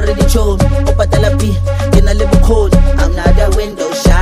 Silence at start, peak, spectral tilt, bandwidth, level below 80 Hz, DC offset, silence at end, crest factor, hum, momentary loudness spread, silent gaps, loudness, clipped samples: 0 s; 0 dBFS; -6 dB/octave; 14.5 kHz; -12 dBFS; under 0.1%; 0 s; 8 dB; none; 4 LU; none; -12 LUFS; 0.8%